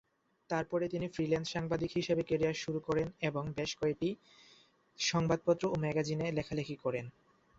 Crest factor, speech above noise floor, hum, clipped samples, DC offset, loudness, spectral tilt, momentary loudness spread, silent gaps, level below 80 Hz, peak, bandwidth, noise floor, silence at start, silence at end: 20 dB; 31 dB; none; under 0.1%; under 0.1%; -35 LUFS; -5.5 dB/octave; 6 LU; none; -62 dBFS; -16 dBFS; 8 kHz; -65 dBFS; 0.5 s; 0.5 s